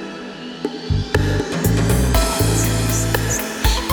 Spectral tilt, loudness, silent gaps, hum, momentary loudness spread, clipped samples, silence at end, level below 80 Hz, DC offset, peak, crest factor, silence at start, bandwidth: -4.5 dB/octave; -19 LUFS; none; none; 11 LU; under 0.1%; 0 s; -24 dBFS; under 0.1%; -4 dBFS; 14 dB; 0 s; over 20 kHz